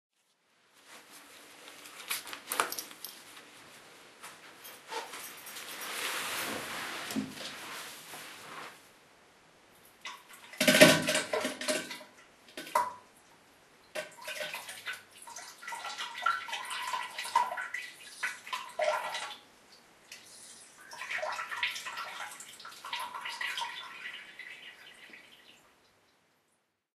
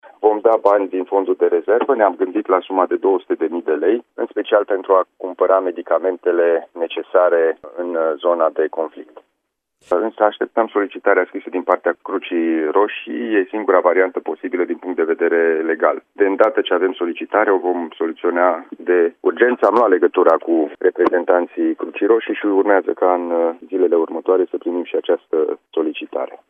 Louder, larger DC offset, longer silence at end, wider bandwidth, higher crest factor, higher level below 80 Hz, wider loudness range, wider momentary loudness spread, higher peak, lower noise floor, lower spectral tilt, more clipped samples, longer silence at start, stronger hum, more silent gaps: second, -33 LUFS vs -18 LUFS; neither; first, 1.4 s vs 0.25 s; first, 13.5 kHz vs 4 kHz; first, 32 dB vs 18 dB; about the same, -78 dBFS vs -74 dBFS; first, 14 LU vs 4 LU; first, 19 LU vs 7 LU; second, -4 dBFS vs 0 dBFS; about the same, -77 dBFS vs -74 dBFS; second, -2.5 dB/octave vs -6 dB/octave; neither; first, 0.85 s vs 0.05 s; neither; neither